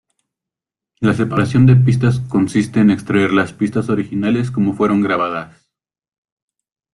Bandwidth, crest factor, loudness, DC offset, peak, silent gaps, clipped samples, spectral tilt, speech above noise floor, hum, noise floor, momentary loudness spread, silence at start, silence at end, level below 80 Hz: 11 kHz; 14 dB; -15 LUFS; under 0.1%; -2 dBFS; none; under 0.1%; -8 dB/octave; 72 dB; none; -86 dBFS; 8 LU; 1 s; 1.45 s; -48 dBFS